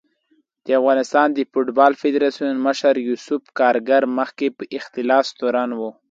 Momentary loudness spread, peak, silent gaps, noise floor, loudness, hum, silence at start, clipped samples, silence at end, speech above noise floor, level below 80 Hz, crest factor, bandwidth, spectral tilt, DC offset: 10 LU; 0 dBFS; none; -64 dBFS; -19 LUFS; none; 0.65 s; under 0.1%; 0.2 s; 45 dB; -72 dBFS; 18 dB; 7.8 kHz; -4 dB/octave; under 0.1%